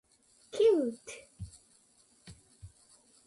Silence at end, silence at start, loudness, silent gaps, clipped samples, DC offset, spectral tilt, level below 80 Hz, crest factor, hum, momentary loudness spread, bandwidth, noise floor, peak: 0.6 s; 0.55 s; -29 LUFS; none; under 0.1%; under 0.1%; -5.5 dB/octave; -62 dBFS; 18 dB; none; 23 LU; 11.5 kHz; -66 dBFS; -16 dBFS